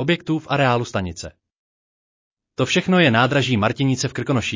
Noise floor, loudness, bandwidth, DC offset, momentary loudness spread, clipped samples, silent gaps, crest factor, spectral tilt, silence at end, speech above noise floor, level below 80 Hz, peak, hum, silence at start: under -90 dBFS; -19 LUFS; 7.6 kHz; under 0.1%; 14 LU; under 0.1%; 1.58-2.36 s; 16 dB; -5.5 dB/octave; 0 s; over 71 dB; -46 dBFS; -4 dBFS; none; 0 s